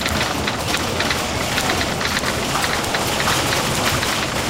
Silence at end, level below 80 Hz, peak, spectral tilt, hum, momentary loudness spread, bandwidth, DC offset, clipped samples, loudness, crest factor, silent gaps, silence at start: 0 s; -36 dBFS; -6 dBFS; -3 dB/octave; none; 3 LU; 17 kHz; 0.2%; under 0.1%; -19 LUFS; 14 dB; none; 0 s